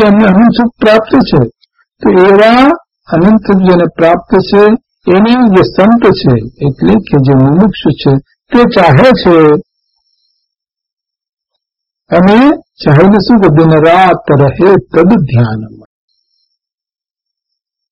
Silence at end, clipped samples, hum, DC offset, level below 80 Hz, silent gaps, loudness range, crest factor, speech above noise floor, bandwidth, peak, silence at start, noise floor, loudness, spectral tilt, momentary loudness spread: 2.25 s; 2%; none; under 0.1%; -34 dBFS; 10.93-10.97 s, 11.33-11.37 s; 5 LU; 8 dB; 83 dB; 7.6 kHz; 0 dBFS; 0 s; -89 dBFS; -7 LUFS; -8.5 dB/octave; 7 LU